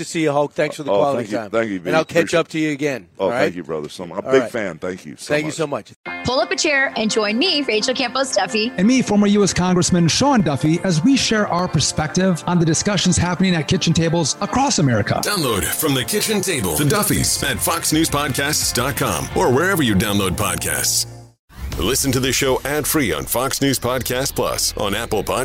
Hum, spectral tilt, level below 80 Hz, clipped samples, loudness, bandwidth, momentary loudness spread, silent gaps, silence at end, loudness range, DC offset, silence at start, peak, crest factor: none; -4 dB/octave; -40 dBFS; under 0.1%; -18 LUFS; 16.5 kHz; 7 LU; 5.96-6.04 s, 21.39-21.48 s; 0 s; 4 LU; under 0.1%; 0 s; 0 dBFS; 18 dB